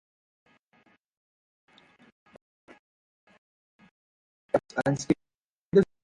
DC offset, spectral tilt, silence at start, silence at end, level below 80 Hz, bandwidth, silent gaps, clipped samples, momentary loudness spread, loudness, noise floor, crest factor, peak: under 0.1%; -6.5 dB/octave; 4.55 s; 0.2 s; -64 dBFS; 11 kHz; 5.35-5.72 s; under 0.1%; 6 LU; -28 LUFS; -90 dBFS; 24 dB; -8 dBFS